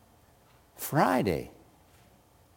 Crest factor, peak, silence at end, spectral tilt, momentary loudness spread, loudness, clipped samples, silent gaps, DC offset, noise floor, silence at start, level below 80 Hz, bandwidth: 22 dB; -10 dBFS; 1.05 s; -5.5 dB/octave; 15 LU; -28 LUFS; under 0.1%; none; under 0.1%; -61 dBFS; 0.8 s; -58 dBFS; 17 kHz